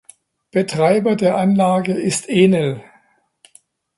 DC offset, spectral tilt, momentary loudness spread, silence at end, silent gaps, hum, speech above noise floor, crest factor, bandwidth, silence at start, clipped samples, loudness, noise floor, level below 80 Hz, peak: under 0.1%; -6 dB/octave; 8 LU; 1.15 s; none; none; 42 dB; 18 dB; 11.5 kHz; 0.55 s; under 0.1%; -17 LUFS; -57 dBFS; -60 dBFS; 0 dBFS